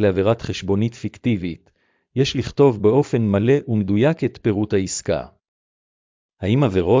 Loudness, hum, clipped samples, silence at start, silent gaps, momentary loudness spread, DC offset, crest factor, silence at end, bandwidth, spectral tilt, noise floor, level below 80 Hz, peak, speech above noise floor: -20 LUFS; none; under 0.1%; 0 s; 5.48-6.29 s; 8 LU; under 0.1%; 16 dB; 0 s; 7.6 kHz; -6.5 dB/octave; under -90 dBFS; -44 dBFS; -4 dBFS; over 71 dB